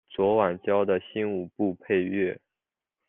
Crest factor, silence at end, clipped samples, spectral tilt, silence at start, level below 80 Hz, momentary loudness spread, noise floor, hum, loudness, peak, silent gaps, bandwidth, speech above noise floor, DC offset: 18 dB; 0.7 s; under 0.1%; -5.5 dB/octave; 0.1 s; -70 dBFS; 7 LU; -89 dBFS; none; -27 LUFS; -10 dBFS; none; 3.8 kHz; 63 dB; under 0.1%